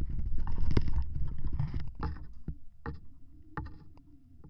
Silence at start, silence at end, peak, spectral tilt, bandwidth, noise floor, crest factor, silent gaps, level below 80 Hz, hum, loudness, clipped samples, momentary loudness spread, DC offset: 0 s; 0 s; -10 dBFS; -8.5 dB/octave; 5.4 kHz; -53 dBFS; 20 dB; none; -36 dBFS; none; -39 LUFS; under 0.1%; 19 LU; under 0.1%